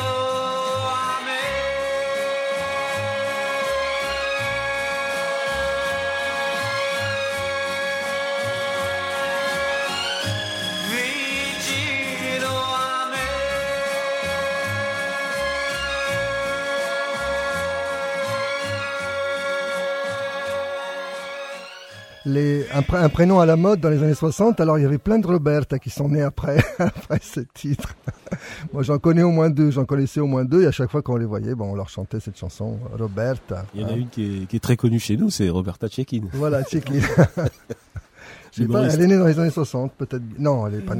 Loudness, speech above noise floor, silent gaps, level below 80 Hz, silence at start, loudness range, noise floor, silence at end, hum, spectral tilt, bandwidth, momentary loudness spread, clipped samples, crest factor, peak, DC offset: -22 LUFS; 25 dB; none; -44 dBFS; 0 s; 6 LU; -44 dBFS; 0 s; none; -5.5 dB/octave; 16 kHz; 11 LU; under 0.1%; 20 dB; -2 dBFS; under 0.1%